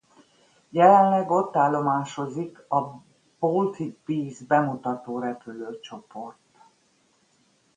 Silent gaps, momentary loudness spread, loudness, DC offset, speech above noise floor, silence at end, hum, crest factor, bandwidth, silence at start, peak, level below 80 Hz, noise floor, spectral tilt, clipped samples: none; 20 LU; -24 LUFS; under 0.1%; 41 dB; 1.45 s; none; 22 dB; 9.4 kHz; 0.75 s; -4 dBFS; -72 dBFS; -65 dBFS; -7 dB/octave; under 0.1%